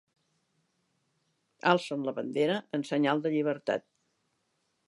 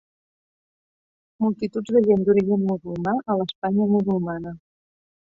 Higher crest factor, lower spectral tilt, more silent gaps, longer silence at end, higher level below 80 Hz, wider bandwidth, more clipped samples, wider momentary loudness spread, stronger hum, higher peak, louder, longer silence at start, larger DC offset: first, 24 dB vs 16 dB; second, -6 dB/octave vs -9 dB/octave; second, none vs 3.55-3.62 s; first, 1.1 s vs 0.65 s; second, -84 dBFS vs -60 dBFS; first, 11.5 kHz vs 7.4 kHz; neither; about the same, 7 LU vs 9 LU; neither; about the same, -8 dBFS vs -6 dBFS; second, -30 LUFS vs -22 LUFS; first, 1.65 s vs 1.4 s; neither